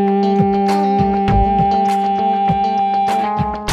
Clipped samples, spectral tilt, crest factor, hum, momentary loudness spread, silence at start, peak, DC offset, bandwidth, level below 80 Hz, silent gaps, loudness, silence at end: under 0.1%; -7 dB/octave; 12 dB; none; 2 LU; 0 s; -4 dBFS; under 0.1%; 12.5 kHz; -30 dBFS; none; -15 LUFS; 0 s